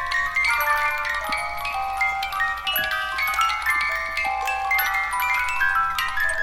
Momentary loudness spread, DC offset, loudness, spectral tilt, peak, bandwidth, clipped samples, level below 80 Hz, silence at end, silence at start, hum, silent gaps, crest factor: 4 LU; under 0.1%; -22 LUFS; -0.5 dB/octave; -8 dBFS; 17 kHz; under 0.1%; -46 dBFS; 0 s; 0 s; none; none; 16 dB